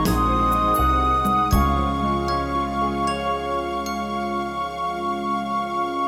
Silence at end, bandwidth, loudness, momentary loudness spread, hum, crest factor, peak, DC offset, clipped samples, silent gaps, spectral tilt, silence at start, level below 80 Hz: 0 s; 17 kHz; -22 LUFS; 7 LU; none; 16 dB; -6 dBFS; under 0.1%; under 0.1%; none; -6 dB/octave; 0 s; -30 dBFS